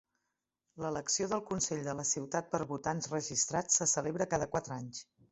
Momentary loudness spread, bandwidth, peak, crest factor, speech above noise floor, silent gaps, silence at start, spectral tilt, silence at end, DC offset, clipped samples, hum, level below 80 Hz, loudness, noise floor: 12 LU; 8.2 kHz; -16 dBFS; 20 dB; 52 dB; none; 0.75 s; -3 dB/octave; 0.3 s; under 0.1%; under 0.1%; none; -66 dBFS; -34 LUFS; -87 dBFS